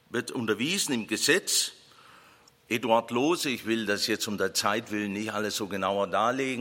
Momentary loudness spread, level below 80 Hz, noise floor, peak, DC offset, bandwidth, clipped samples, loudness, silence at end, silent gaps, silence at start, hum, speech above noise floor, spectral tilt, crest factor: 7 LU; -72 dBFS; -58 dBFS; -10 dBFS; under 0.1%; 16.5 kHz; under 0.1%; -27 LUFS; 0 s; none; 0.1 s; none; 30 dB; -2.5 dB/octave; 20 dB